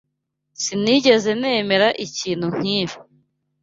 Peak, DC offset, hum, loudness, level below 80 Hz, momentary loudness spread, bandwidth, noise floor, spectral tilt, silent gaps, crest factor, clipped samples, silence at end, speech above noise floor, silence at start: -2 dBFS; under 0.1%; none; -19 LUFS; -62 dBFS; 11 LU; 8 kHz; -76 dBFS; -4 dB/octave; none; 18 dB; under 0.1%; 0.6 s; 57 dB; 0.6 s